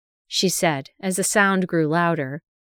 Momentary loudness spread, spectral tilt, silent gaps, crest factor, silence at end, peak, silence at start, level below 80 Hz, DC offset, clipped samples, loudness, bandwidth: 9 LU; -4 dB/octave; none; 18 dB; 0.25 s; -4 dBFS; 0.3 s; -64 dBFS; under 0.1%; under 0.1%; -21 LUFS; over 20 kHz